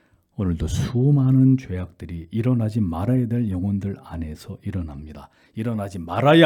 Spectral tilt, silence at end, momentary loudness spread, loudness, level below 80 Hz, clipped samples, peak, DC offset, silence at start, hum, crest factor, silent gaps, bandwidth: -7.5 dB/octave; 0 s; 17 LU; -22 LUFS; -42 dBFS; under 0.1%; 0 dBFS; under 0.1%; 0.4 s; none; 20 dB; none; 12 kHz